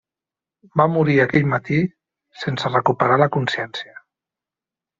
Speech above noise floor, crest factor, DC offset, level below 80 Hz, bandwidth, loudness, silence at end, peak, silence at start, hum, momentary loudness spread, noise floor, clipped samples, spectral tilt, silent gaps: 70 dB; 18 dB; under 0.1%; -58 dBFS; 7.6 kHz; -19 LUFS; 1.15 s; -2 dBFS; 0.75 s; none; 12 LU; -89 dBFS; under 0.1%; -5 dB/octave; none